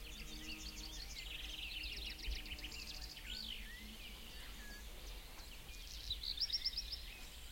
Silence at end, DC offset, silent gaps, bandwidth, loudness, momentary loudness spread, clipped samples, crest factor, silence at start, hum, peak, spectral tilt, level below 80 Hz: 0 s; under 0.1%; none; 16.5 kHz; -46 LUFS; 13 LU; under 0.1%; 20 dB; 0 s; none; -28 dBFS; -2 dB/octave; -52 dBFS